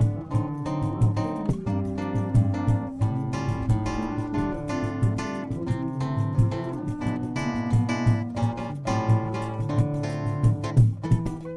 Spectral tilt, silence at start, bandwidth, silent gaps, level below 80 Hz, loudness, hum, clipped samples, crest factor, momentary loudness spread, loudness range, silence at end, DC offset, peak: -8 dB/octave; 0 s; 10.5 kHz; none; -40 dBFS; -26 LUFS; none; under 0.1%; 16 dB; 6 LU; 2 LU; 0 s; under 0.1%; -8 dBFS